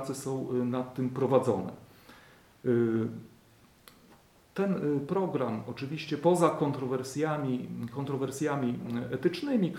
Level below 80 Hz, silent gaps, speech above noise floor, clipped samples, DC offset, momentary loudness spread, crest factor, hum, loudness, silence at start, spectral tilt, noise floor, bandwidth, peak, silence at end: -70 dBFS; none; 30 dB; under 0.1%; under 0.1%; 10 LU; 22 dB; none; -31 LUFS; 0 s; -7 dB/octave; -60 dBFS; 16.5 kHz; -10 dBFS; 0 s